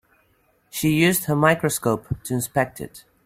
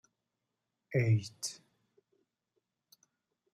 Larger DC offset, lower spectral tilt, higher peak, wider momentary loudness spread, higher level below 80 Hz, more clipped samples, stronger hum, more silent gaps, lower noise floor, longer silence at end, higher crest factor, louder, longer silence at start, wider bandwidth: neither; about the same, -5 dB/octave vs -5.5 dB/octave; first, -4 dBFS vs -20 dBFS; about the same, 13 LU vs 13 LU; first, -52 dBFS vs -72 dBFS; neither; neither; neither; second, -63 dBFS vs -87 dBFS; second, 0.25 s vs 2 s; about the same, 20 dB vs 20 dB; first, -21 LUFS vs -34 LUFS; second, 0.75 s vs 0.9 s; first, 16 kHz vs 13.5 kHz